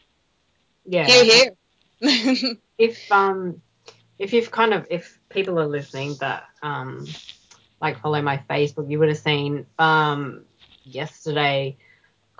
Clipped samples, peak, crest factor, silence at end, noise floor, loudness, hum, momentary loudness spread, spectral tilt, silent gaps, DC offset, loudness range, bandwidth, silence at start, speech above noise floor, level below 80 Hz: under 0.1%; 0 dBFS; 22 dB; 0.65 s; -67 dBFS; -20 LUFS; none; 18 LU; -4 dB/octave; none; under 0.1%; 9 LU; 7.6 kHz; 0.85 s; 47 dB; -70 dBFS